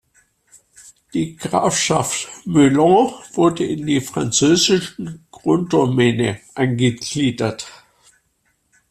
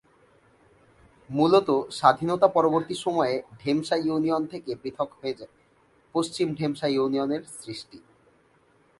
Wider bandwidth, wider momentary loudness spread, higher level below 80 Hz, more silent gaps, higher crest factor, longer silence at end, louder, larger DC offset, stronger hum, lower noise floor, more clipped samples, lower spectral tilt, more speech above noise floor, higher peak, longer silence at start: first, 14 kHz vs 11.5 kHz; second, 11 LU vs 14 LU; first, -54 dBFS vs -66 dBFS; neither; second, 16 dB vs 24 dB; first, 1.15 s vs 1 s; first, -18 LUFS vs -25 LUFS; neither; neither; first, -66 dBFS vs -62 dBFS; neither; about the same, -4.5 dB/octave vs -5.5 dB/octave; first, 48 dB vs 37 dB; about the same, -2 dBFS vs -2 dBFS; second, 1.15 s vs 1.3 s